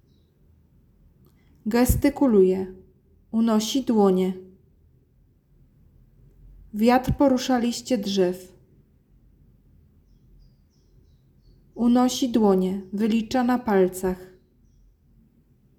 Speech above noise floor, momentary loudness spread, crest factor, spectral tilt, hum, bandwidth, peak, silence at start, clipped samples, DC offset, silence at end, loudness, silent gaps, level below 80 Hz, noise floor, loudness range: 39 dB; 10 LU; 18 dB; -6 dB/octave; none; 18.5 kHz; -6 dBFS; 1.65 s; under 0.1%; under 0.1%; 1.55 s; -22 LUFS; none; -42 dBFS; -60 dBFS; 6 LU